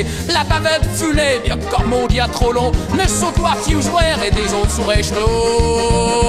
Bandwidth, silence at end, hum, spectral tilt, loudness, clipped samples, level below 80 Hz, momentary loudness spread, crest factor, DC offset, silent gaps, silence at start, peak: 15.5 kHz; 0 s; none; -4.5 dB/octave; -16 LUFS; under 0.1%; -22 dBFS; 2 LU; 14 dB; under 0.1%; none; 0 s; -2 dBFS